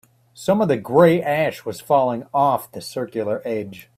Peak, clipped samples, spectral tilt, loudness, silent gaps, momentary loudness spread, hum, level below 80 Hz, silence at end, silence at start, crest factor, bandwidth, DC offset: 0 dBFS; under 0.1%; -6.5 dB/octave; -20 LUFS; none; 13 LU; none; -60 dBFS; 0.15 s; 0.4 s; 20 dB; 16 kHz; under 0.1%